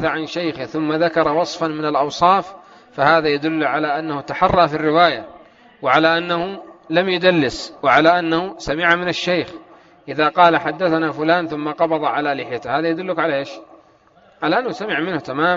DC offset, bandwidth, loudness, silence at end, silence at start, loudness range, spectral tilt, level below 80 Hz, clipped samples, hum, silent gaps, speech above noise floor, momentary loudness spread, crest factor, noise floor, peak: under 0.1%; 7.6 kHz; -18 LUFS; 0 s; 0 s; 4 LU; -3 dB/octave; -50 dBFS; under 0.1%; none; none; 34 dB; 10 LU; 18 dB; -52 dBFS; 0 dBFS